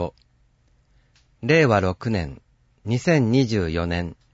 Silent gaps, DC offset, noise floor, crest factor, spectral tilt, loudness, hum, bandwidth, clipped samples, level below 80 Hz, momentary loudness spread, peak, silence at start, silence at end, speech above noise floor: none; under 0.1%; -61 dBFS; 18 dB; -6.5 dB/octave; -21 LUFS; none; 8 kHz; under 0.1%; -44 dBFS; 14 LU; -6 dBFS; 0 s; 0.2 s; 40 dB